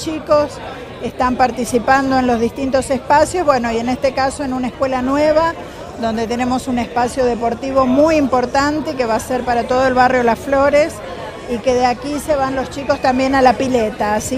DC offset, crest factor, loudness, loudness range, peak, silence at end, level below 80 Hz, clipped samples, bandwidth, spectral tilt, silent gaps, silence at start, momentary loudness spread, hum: under 0.1%; 16 dB; -16 LUFS; 3 LU; 0 dBFS; 0 s; -38 dBFS; under 0.1%; 15 kHz; -5 dB/octave; none; 0 s; 9 LU; none